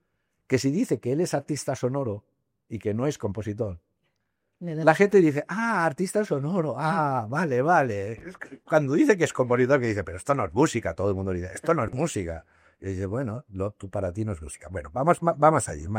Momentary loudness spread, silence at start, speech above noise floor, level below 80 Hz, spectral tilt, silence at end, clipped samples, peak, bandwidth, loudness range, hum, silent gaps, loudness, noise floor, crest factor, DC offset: 14 LU; 0.5 s; 53 dB; -56 dBFS; -6 dB/octave; 0 s; under 0.1%; -4 dBFS; 16 kHz; 6 LU; none; none; -25 LUFS; -78 dBFS; 22 dB; under 0.1%